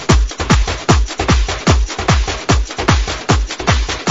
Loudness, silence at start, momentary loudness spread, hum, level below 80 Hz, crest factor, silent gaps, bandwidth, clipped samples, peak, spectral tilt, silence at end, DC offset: -15 LUFS; 0 s; 2 LU; none; -18 dBFS; 14 dB; none; 7.8 kHz; 0.1%; 0 dBFS; -4.5 dB/octave; 0 s; 0.6%